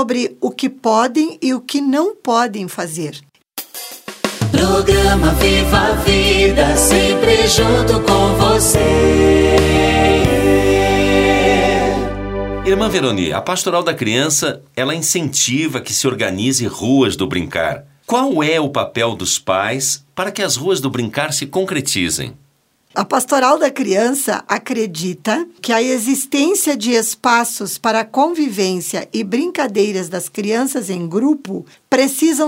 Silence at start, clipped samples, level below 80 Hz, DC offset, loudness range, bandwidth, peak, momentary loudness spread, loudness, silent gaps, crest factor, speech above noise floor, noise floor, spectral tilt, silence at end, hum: 0 s; under 0.1%; -28 dBFS; under 0.1%; 6 LU; 16.5 kHz; 0 dBFS; 10 LU; -15 LUFS; none; 16 dB; 42 dB; -57 dBFS; -4 dB/octave; 0 s; none